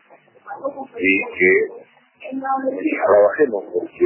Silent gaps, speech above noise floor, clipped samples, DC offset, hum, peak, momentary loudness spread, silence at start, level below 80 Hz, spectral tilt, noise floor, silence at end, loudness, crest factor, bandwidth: none; 27 dB; under 0.1%; under 0.1%; none; -4 dBFS; 15 LU; 0.45 s; -60 dBFS; -8.5 dB/octave; -45 dBFS; 0 s; -18 LUFS; 16 dB; 3.1 kHz